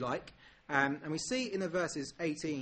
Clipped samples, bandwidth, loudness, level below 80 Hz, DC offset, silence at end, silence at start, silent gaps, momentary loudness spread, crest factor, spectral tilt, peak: under 0.1%; 8.8 kHz; -35 LUFS; -66 dBFS; under 0.1%; 0 s; 0 s; none; 7 LU; 22 dB; -4 dB/octave; -14 dBFS